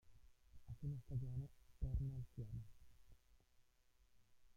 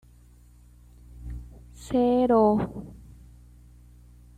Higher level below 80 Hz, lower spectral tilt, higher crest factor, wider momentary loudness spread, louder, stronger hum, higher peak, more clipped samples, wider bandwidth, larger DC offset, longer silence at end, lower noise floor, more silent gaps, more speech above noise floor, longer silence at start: second, -56 dBFS vs -46 dBFS; first, -9.5 dB/octave vs -8 dB/octave; about the same, 18 dB vs 18 dB; second, 12 LU vs 26 LU; second, -50 LUFS vs -23 LUFS; second, none vs 60 Hz at -45 dBFS; second, -32 dBFS vs -10 dBFS; neither; second, 9.6 kHz vs 13 kHz; neither; second, 0.05 s vs 1.4 s; first, -75 dBFS vs -53 dBFS; neither; about the same, 28 dB vs 31 dB; second, 0.05 s vs 1.15 s